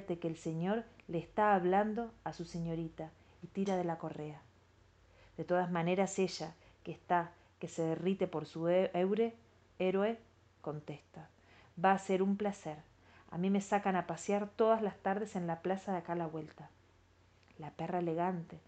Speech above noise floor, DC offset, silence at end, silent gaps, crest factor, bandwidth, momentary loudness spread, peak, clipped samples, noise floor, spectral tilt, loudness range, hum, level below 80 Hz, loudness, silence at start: 31 dB; under 0.1%; 0.1 s; none; 20 dB; 9 kHz; 17 LU; -16 dBFS; under 0.1%; -67 dBFS; -6.5 dB/octave; 5 LU; none; -70 dBFS; -36 LUFS; 0 s